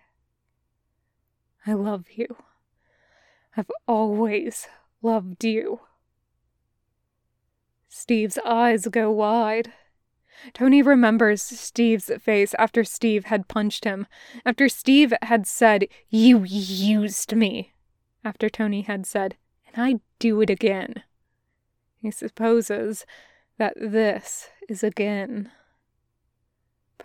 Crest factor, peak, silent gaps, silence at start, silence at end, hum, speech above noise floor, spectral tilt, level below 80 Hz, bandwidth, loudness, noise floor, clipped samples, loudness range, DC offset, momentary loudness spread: 20 dB; -4 dBFS; none; 1.65 s; 1.55 s; none; 54 dB; -4.5 dB/octave; -66 dBFS; 18 kHz; -22 LUFS; -75 dBFS; under 0.1%; 10 LU; under 0.1%; 17 LU